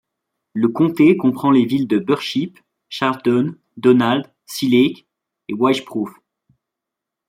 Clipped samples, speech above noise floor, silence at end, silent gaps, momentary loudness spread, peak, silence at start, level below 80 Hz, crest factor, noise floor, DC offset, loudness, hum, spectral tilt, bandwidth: under 0.1%; 67 dB; 1.2 s; none; 16 LU; -2 dBFS; 0.55 s; -64 dBFS; 16 dB; -83 dBFS; under 0.1%; -17 LUFS; none; -6.5 dB/octave; 16 kHz